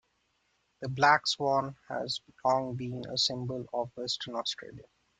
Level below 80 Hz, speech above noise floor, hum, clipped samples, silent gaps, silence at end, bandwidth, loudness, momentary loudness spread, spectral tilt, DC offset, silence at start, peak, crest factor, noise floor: -68 dBFS; 44 dB; none; under 0.1%; none; 0.35 s; 9.4 kHz; -30 LUFS; 13 LU; -3.5 dB/octave; under 0.1%; 0.8 s; -8 dBFS; 24 dB; -75 dBFS